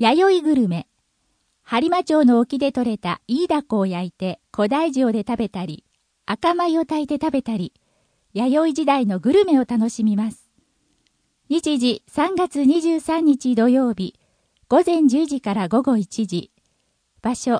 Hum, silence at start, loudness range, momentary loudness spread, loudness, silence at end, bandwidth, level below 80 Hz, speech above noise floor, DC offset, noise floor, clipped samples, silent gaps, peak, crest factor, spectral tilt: none; 0 s; 4 LU; 11 LU; -20 LUFS; 0 s; 10.5 kHz; -58 dBFS; 49 dB; under 0.1%; -68 dBFS; under 0.1%; none; -4 dBFS; 16 dB; -6 dB/octave